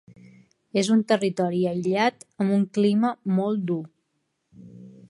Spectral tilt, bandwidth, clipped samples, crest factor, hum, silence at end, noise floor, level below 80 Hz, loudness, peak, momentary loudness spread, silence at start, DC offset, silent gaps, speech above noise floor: -6.5 dB/octave; 11.5 kHz; under 0.1%; 18 dB; none; 0.2 s; -75 dBFS; -72 dBFS; -24 LUFS; -8 dBFS; 7 LU; 0.75 s; under 0.1%; none; 52 dB